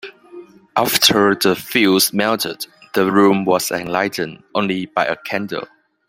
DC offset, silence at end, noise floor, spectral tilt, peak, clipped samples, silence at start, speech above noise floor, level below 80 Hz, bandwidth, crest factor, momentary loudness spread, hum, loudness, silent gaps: under 0.1%; 0.45 s; -40 dBFS; -3.5 dB/octave; 0 dBFS; under 0.1%; 0.05 s; 23 dB; -58 dBFS; 16.5 kHz; 18 dB; 13 LU; none; -17 LUFS; none